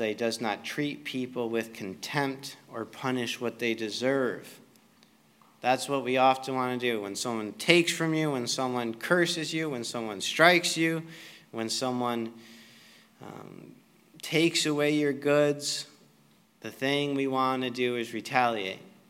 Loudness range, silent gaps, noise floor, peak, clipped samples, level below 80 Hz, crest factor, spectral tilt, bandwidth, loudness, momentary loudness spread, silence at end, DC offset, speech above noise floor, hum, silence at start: 6 LU; none; -62 dBFS; -2 dBFS; under 0.1%; -84 dBFS; 28 dB; -4 dB/octave; 16 kHz; -28 LUFS; 16 LU; 0.2 s; under 0.1%; 34 dB; none; 0 s